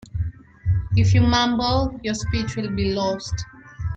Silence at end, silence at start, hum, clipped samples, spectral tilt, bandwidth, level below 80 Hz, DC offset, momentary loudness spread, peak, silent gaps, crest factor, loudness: 0 s; 0.15 s; none; under 0.1%; -6 dB/octave; 8 kHz; -34 dBFS; under 0.1%; 14 LU; -6 dBFS; none; 16 dB; -22 LUFS